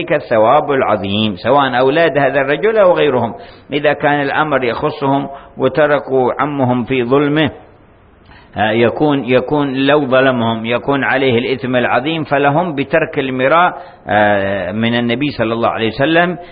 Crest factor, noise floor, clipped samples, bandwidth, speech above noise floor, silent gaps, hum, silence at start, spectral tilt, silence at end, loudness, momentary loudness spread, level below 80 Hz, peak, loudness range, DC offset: 14 dB; -45 dBFS; under 0.1%; 5.2 kHz; 31 dB; none; none; 0 s; -11.5 dB/octave; 0 s; -14 LUFS; 6 LU; -46 dBFS; 0 dBFS; 2 LU; under 0.1%